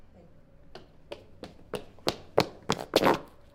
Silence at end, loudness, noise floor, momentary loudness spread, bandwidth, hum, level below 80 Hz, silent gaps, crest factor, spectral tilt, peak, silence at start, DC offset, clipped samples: 0.3 s; -30 LUFS; -54 dBFS; 22 LU; 18 kHz; none; -56 dBFS; none; 30 dB; -4.5 dB/octave; -2 dBFS; 0.75 s; under 0.1%; under 0.1%